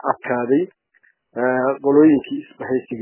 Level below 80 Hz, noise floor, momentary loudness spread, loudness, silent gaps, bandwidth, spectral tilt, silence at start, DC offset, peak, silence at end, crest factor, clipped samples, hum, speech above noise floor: -62 dBFS; -60 dBFS; 16 LU; -18 LUFS; none; 3.2 kHz; -11 dB/octave; 0.05 s; under 0.1%; -2 dBFS; 0 s; 18 dB; under 0.1%; none; 42 dB